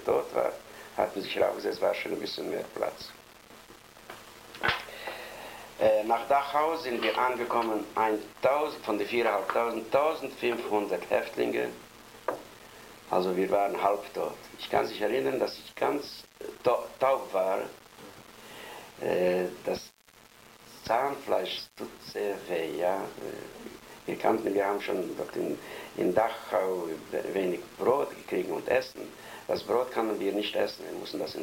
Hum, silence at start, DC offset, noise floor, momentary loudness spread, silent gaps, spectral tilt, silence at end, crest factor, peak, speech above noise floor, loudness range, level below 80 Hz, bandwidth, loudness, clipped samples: none; 0 s; under 0.1%; -57 dBFS; 17 LU; none; -4.5 dB/octave; 0 s; 20 dB; -10 dBFS; 28 dB; 5 LU; -64 dBFS; 16.5 kHz; -30 LUFS; under 0.1%